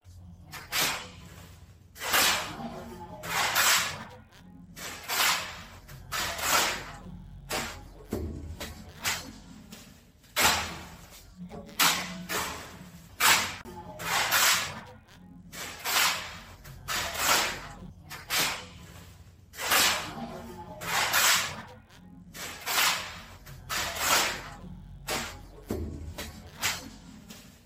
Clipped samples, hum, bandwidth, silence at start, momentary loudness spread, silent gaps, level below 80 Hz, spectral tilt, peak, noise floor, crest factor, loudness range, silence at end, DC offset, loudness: under 0.1%; none; 16.5 kHz; 0.05 s; 24 LU; none; -52 dBFS; -1 dB/octave; -8 dBFS; -54 dBFS; 24 dB; 5 LU; 0.1 s; under 0.1%; -27 LUFS